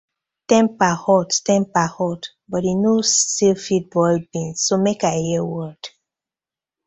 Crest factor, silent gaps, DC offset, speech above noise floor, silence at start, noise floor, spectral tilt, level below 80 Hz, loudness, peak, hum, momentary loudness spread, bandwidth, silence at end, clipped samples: 18 dB; none; under 0.1%; over 71 dB; 0.5 s; under -90 dBFS; -4 dB/octave; -58 dBFS; -19 LUFS; -2 dBFS; none; 11 LU; 8.4 kHz; 1 s; under 0.1%